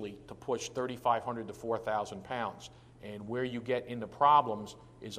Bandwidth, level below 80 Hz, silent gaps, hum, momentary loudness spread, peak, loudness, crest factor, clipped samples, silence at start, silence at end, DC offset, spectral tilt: 15 kHz; -66 dBFS; none; none; 21 LU; -12 dBFS; -33 LUFS; 22 dB; under 0.1%; 0 s; 0 s; under 0.1%; -5 dB/octave